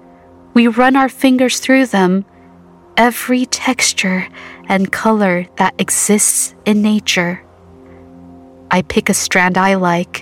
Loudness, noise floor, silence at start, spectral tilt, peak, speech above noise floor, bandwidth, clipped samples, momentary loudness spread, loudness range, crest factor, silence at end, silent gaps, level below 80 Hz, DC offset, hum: -13 LUFS; -42 dBFS; 0.55 s; -3.5 dB/octave; 0 dBFS; 29 dB; 17 kHz; under 0.1%; 7 LU; 2 LU; 14 dB; 0 s; none; -50 dBFS; under 0.1%; none